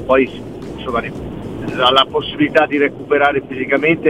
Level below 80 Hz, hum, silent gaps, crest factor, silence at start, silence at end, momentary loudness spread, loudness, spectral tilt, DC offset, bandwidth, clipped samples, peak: -42 dBFS; none; none; 16 dB; 0 s; 0 s; 15 LU; -16 LUFS; -6 dB/octave; 0.4%; 12.5 kHz; under 0.1%; 0 dBFS